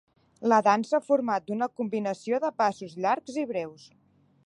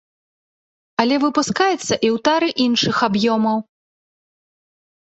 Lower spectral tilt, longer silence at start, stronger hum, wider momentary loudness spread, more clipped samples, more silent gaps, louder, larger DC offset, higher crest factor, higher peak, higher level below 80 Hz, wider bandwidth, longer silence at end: first, -5.5 dB/octave vs -4 dB/octave; second, 0.4 s vs 1 s; neither; first, 9 LU vs 4 LU; neither; neither; second, -27 LUFS vs -18 LUFS; neither; about the same, 20 dB vs 18 dB; second, -8 dBFS vs -2 dBFS; second, -76 dBFS vs -60 dBFS; first, 11 kHz vs 8.2 kHz; second, 0.7 s vs 1.4 s